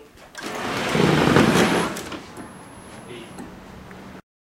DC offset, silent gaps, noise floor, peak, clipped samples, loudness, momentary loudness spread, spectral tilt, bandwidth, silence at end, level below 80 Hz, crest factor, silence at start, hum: under 0.1%; none; -41 dBFS; 0 dBFS; under 0.1%; -20 LUFS; 25 LU; -5 dB/octave; 16.5 kHz; 0.25 s; -48 dBFS; 22 dB; 0 s; none